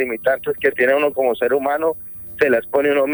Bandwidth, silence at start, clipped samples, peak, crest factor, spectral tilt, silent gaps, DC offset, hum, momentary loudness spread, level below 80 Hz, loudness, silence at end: over 20 kHz; 0 s; under 0.1%; -2 dBFS; 16 dB; -6.5 dB/octave; none; under 0.1%; none; 5 LU; -56 dBFS; -18 LUFS; 0 s